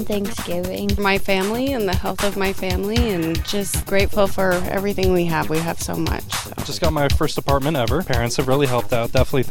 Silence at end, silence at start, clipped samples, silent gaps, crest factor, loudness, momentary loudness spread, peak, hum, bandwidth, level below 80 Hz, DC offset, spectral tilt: 0 s; 0 s; under 0.1%; none; 16 dB; -21 LUFS; 5 LU; -2 dBFS; none; 17 kHz; -30 dBFS; under 0.1%; -5 dB/octave